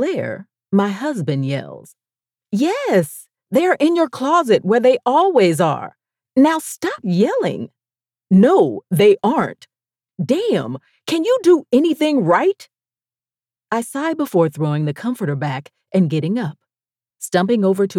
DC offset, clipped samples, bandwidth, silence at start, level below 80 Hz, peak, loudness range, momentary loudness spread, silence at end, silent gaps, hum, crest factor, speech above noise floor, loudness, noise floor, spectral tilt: under 0.1%; under 0.1%; 16 kHz; 0 s; -68 dBFS; -4 dBFS; 5 LU; 13 LU; 0 s; none; none; 14 dB; over 74 dB; -17 LUFS; under -90 dBFS; -6.5 dB/octave